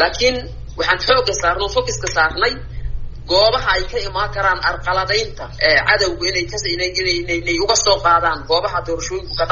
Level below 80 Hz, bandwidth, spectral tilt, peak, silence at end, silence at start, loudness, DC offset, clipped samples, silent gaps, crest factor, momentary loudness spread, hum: -32 dBFS; 7.4 kHz; -1 dB/octave; 0 dBFS; 0 s; 0 s; -17 LUFS; under 0.1%; under 0.1%; none; 16 dB; 10 LU; none